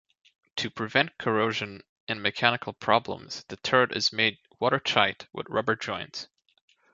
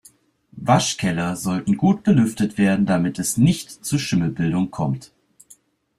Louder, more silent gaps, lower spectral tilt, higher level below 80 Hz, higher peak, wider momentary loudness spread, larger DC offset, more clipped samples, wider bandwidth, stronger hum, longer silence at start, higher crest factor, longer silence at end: second, -26 LUFS vs -20 LUFS; first, 1.89-2.07 s vs none; second, -4 dB/octave vs -5.5 dB/octave; second, -64 dBFS vs -52 dBFS; about the same, -2 dBFS vs -2 dBFS; first, 14 LU vs 7 LU; neither; neither; second, 7.8 kHz vs 14.5 kHz; neither; about the same, 0.55 s vs 0.55 s; first, 26 dB vs 18 dB; second, 0.7 s vs 0.95 s